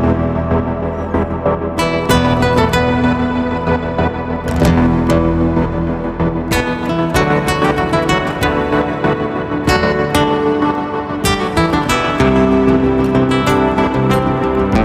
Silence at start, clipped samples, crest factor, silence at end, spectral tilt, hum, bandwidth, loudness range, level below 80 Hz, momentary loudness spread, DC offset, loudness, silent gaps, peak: 0 s; under 0.1%; 12 dB; 0 s; -6 dB/octave; none; 16 kHz; 2 LU; -28 dBFS; 6 LU; under 0.1%; -15 LUFS; none; -2 dBFS